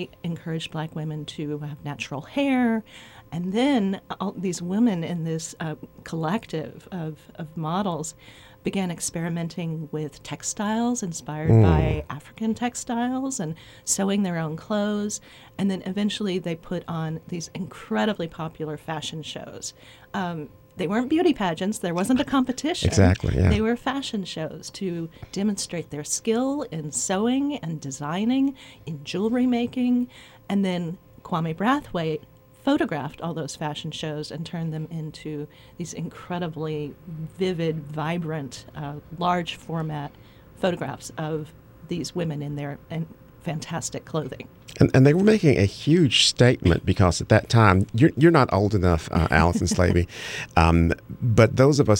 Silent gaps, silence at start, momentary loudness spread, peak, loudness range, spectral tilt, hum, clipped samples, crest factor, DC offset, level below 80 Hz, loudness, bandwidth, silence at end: none; 0 s; 15 LU; -2 dBFS; 11 LU; -5.5 dB/octave; none; under 0.1%; 22 dB; under 0.1%; -42 dBFS; -24 LUFS; 16.5 kHz; 0 s